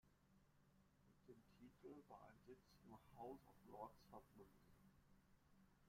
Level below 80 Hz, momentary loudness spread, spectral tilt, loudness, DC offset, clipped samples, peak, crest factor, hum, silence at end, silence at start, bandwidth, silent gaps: -82 dBFS; 8 LU; -6.5 dB/octave; -64 LUFS; under 0.1%; under 0.1%; -42 dBFS; 24 dB; none; 0 s; 0.05 s; 16 kHz; none